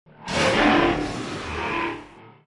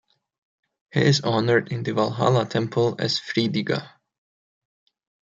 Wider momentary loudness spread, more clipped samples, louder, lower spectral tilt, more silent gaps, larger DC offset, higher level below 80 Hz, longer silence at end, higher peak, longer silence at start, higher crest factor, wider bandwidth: first, 12 LU vs 7 LU; neither; about the same, -22 LUFS vs -23 LUFS; about the same, -4.5 dB/octave vs -5.5 dB/octave; neither; neither; first, -44 dBFS vs -64 dBFS; second, 0.15 s vs 1.4 s; about the same, -6 dBFS vs -4 dBFS; second, 0.2 s vs 0.95 s; about the same, 18 dB vs 20 dB; first, 11.5 kHz vs 7.8 kHz